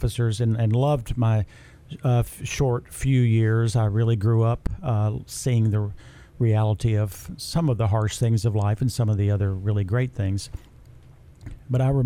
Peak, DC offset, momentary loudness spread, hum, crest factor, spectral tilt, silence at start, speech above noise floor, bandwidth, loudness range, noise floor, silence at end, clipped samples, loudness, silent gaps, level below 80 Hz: -10 dBFS; under 0.1%; 8 LU; none; 12 dB; -7 dB/octave; 0 s; 26 dB; 14 kHz; 2 LU; -48 dBFS; 0 s; under 0.1%; -23 LUFS; none; -40 dBFS